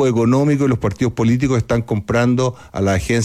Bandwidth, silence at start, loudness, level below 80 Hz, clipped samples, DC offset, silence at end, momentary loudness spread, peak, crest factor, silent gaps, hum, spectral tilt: 14 kHz; 0 s; -17 LUFS; -38 dBFS; under 0.1%; under 0.1%; 0 s; 5 LU; -6 dBFS; 10 dB; none; none; -7 dB/octave